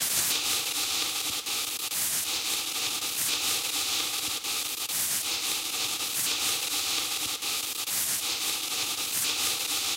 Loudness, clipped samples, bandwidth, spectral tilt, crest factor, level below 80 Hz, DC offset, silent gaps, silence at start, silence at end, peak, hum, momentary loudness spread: -27 LUFS; under 0.1%; 16 kHz; 1.5 dB/octave; 16 dB; -66 dBFS; under 0.1%; none; 0 s; 0 s; -14 dBFS; none; 3 LU